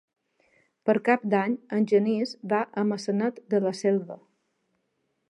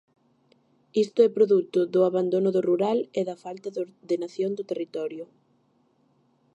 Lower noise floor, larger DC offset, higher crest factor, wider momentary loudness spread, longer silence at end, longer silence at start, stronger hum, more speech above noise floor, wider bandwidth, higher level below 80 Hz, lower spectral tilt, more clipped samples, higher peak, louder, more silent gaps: first, -76 dBFS vs -66 dBFS; neither; about the same, 20 dB vs 18 dB; second, 6 LU vs 13 LU; second, 1.15 s vs 1.3 s; about the same, 0.85 s vs 0.95 s; neither; first, 51 dB vs 42 dB; first, 11 kHz vs 8.4 kHz; about the same, -80 dBFS vs -80 dBFS; about the same, -6.5 dB/octave vs -7.5 dB/octave; neither; about the same, -8 dBFS vs -8 dBFS; about the same, -26 LUFS vs -25 LUFS; neither